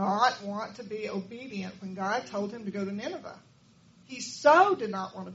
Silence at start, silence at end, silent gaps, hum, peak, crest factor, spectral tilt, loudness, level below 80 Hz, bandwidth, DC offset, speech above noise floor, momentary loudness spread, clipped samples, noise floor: 0 s; 0 s; none; none; -8 dBFS; 22 dB; -3.5 dB/octave; -29 LUFS; -74 dBFS; 8 kHz; under 0.1%; 30 dB; 17 LU; under 0.1%; -59 dBFS